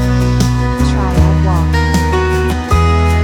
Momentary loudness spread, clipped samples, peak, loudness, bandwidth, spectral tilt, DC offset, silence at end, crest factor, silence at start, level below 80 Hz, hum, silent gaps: 2 LU; under 0.1%; 0 dBFS; -13 LUFS; 14.5 kHz; -6.5 dB/octave; under 0.1%; 0 s; 10 dB; 0 s; -16 dBFS; none; none